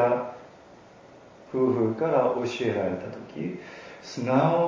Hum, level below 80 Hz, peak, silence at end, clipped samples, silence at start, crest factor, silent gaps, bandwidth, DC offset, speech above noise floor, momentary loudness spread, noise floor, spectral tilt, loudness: none; -64 dBFS; -10 dBFS; 0 s; under 0.1%; 0 s; 16 dB; none; 7.6 kHz; under 0.1%; 25 dB; 16 LU; -50 dBFS; -7 dB/octave; -27 LUFS